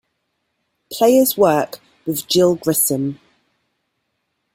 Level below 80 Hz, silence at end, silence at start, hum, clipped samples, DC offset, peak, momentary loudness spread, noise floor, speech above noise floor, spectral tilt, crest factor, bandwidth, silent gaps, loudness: -60 dBFS; 1.4 s; 0.9 s; none; under 0.1%; under 0.1%; -2 dBFS; 14 LU; -72 dBFS; 57 dB; -4 dB/octave; 18 dB; 16.5 kHz; none; -16 LUFS